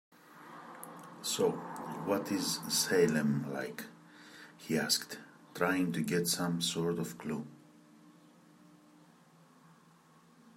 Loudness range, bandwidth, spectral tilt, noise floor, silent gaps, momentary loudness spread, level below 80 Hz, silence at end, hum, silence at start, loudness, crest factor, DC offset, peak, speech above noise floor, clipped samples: 7 LU; 16 kHz; -3.5 dB/octave; -63 dBFS; none; 21 LU; -78 dBFS; 2.45 s; none; 0.3 s; -33 LUFS; 22 dB; under 0.1%; -14 dBFS; 29 dB; under 0.1%